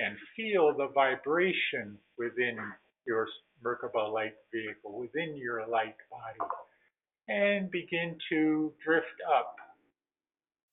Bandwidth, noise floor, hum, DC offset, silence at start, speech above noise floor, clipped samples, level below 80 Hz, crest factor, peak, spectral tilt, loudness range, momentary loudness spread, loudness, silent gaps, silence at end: 4 kHz; under -90 dBFS; none; under 0.1%; 0 s; over 58 dB; under 0.1%; -80 dBFS; 20 dB; -12 dBFS; -3 dB/octave; 5 LU; 13 LU; -32 LUFS; none; 1.05 s